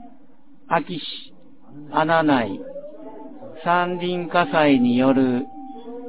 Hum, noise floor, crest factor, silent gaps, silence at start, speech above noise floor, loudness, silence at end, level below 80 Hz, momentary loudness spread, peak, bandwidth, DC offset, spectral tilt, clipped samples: none; -53 dBFS; 18 dB; none; 0 s; 33 dB; -20 LUFS; 0 s; -60 dBFS; 21 LU; -4 dBFS; 4 kHz; 1%; -10 dB/octave; under 0.1%